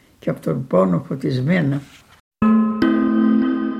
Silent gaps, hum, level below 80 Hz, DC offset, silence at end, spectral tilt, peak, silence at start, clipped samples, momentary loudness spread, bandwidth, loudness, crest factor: 2.20-2.31 s; none; -54 dBFS; under 0.1%; 0 s; -9 dB/octave; -4 dBFS; 0.25 s; under 0.1%; 8 LU; 8.2 kHz; -19 LUFS; 14 dB